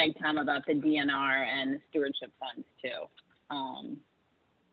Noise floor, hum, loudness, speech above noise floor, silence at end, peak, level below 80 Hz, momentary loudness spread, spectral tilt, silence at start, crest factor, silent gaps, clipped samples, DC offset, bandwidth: -72 dBFS; none; -32 LUFS; 40 dB; 0.75 s; -14 dBFS; -78 dBFS; 15 LU; -7 dB/octave; 0 s; 20 dB; none; under 0.1%; under 0.1%; 4.9 kHz